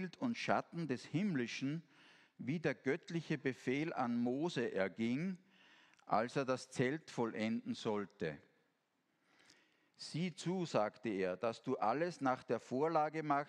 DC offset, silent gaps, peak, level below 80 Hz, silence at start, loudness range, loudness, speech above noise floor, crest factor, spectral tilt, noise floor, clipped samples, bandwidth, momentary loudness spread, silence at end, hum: under 0.1%; none; -18 dBFS; -84 dBFS; 0 s; 5 LU; -39 LUFS; 43 dB; 22 dB; -6 dB/octave; -82 dBFS; under 0.1%; 10.5 kHz; 7 LU; 0 s; none